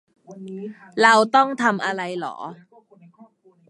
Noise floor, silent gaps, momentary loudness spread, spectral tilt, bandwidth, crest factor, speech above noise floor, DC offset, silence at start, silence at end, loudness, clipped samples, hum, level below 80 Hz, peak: -52 dBFS; none; 21 LU; -4 dB/octave; 11.5 kHz; 22 dB; 31 dB; under 0.1%; 0.3 s; 1.15 s; -19 LUFS; under 0.1%; none; -76 dBFS; 0 dBFS